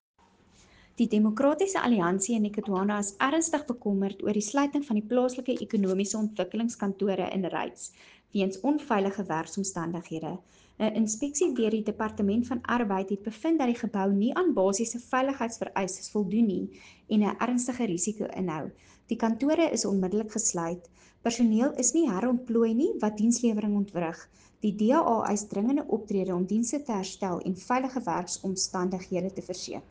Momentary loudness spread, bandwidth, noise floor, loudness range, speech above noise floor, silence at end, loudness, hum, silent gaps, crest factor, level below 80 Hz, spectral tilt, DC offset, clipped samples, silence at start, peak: 8 LU; 10 kHz; -60 dBFS; 4 LU; 32 dB; 0.1 s; -28 LUFS; none; none; 18 dB; -64 dBFS; -5 dB/octave; under 0.1%; under 0.1%; 1 s; -10 dBFS